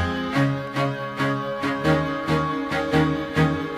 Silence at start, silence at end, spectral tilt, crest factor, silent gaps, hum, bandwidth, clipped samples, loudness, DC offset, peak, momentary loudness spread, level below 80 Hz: 0 s; 0 s; -6.5 dB/octave; 16 dB; none; none; 15 kHz; under 0.1%; -23 LUFS; under 0.1%; -8 dBFS; 4 LU; -46 dBFS